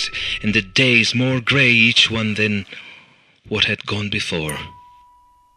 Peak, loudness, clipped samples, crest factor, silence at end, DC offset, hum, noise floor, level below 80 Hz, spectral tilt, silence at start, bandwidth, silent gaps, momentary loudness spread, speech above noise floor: 0 dBFS; -16 LUFS; under 0.1%; 20 dB; 0.8 s; under 0.1%; none; -53 dBFS; -46 dBFS; -4 dB/octave; 0 s; 13 kHz; none; 15 LU; 35 dB